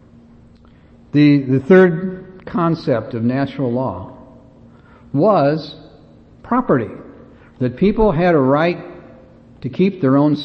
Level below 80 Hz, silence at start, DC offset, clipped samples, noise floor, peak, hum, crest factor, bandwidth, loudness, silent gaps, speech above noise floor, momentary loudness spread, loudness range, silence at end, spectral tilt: -40 dBFS; 1.15 s; under 0.1%; under 0.1%; -46 dBFS; 0 dBFS; none; 16 dB; 6.2 kHz; -16 LUFS; none; 31 dB; 16 LU; 5 LU; 0 s; -9.5 dB/octave